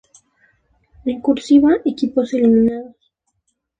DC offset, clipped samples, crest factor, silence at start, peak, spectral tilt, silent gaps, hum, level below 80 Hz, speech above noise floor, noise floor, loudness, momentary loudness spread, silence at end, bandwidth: under 0.1%; under 0.1%; 16 dB; 1.05 s; -2 dBFS; -6.5 dB/octave; none; none; -52 dBFS; 56 dB; -71 dBFS; -16 LUFS; 13 LU; 0.9 s; 9 kHz